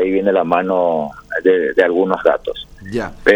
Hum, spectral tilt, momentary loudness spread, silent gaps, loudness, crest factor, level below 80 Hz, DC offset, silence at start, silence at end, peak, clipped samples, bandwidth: none; -6.5 dB/octave; 10 LU; none; -16 LUFS; 16 dB; -44 dBFS; under 0.1%; 0 s; 0 s; 0 dBFS; under 0.1%; 9.4 kHz